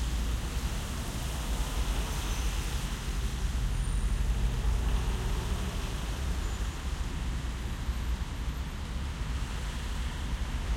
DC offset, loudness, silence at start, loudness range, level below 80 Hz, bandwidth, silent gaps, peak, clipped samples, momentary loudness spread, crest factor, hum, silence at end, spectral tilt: under 0.1%; -34 LUFS; 0 s; 3 LU; -32 dBFS; 16.5 kHz; none; -18 dBFS; under 0.1%; 5 LU; 14 dB; none; 0 s; -4.5 dB/octave